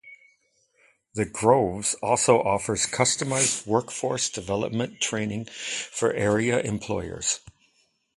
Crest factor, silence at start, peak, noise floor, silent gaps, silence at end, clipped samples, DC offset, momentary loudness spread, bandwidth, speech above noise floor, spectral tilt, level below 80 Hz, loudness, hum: 24 dB; 0.05 s; -2 dBFS; -68 dBFS; none; 0.65 s; under 0.1%; under 0.1%; 10 LU; 11.5 kHz; 43 dB; -3.5 dB/octave; -54 dBFS; -25 LUFS; none